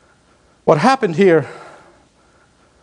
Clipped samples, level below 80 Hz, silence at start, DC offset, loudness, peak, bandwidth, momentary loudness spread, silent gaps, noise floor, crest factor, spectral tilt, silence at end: under 0.1%; -60 dBFS; 0.65 s; under 0.1%; -14 LUFS; 0 dBFS; 10.5 kHz; 17 LU; none; -54 dBFS; 18 dB; -6.5 dB/octave; 1.2 s